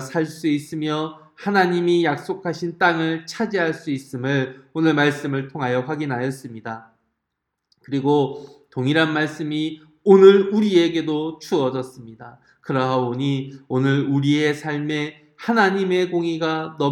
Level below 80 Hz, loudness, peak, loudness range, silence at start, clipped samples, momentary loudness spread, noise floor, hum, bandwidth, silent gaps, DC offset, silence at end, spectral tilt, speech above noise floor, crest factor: -70 dBFS; -20 LUFS; 0 dBFS; 7 LU; 0 s; under 0.1%; 12 LU; -79 dBFS; none; 12.5 kHz; none; under 0.1%; 0 s; -6.5 dB/octave; 59 dB; 20 dB